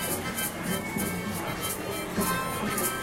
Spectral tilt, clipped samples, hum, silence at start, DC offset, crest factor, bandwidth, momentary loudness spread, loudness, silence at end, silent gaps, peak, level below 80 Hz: -3.5 dB/octave; under 0.1%; none; 0 s; under 0.1%; 16 dB; 16 kHz; 4 LU; -30 LUFS; 0 s; none; -14 dBFS; -52 dBFS